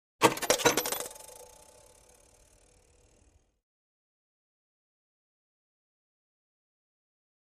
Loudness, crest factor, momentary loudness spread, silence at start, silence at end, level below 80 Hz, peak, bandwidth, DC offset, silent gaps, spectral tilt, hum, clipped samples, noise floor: -28 LUFS; 32 dB; 23 LU; 0.2 s; 6.05 s; -66 dBFS; -6 dBFS; 15.5 kHz; under 0.1%; none; -2 dB/octave; none; under 0.1%; -65 dBFS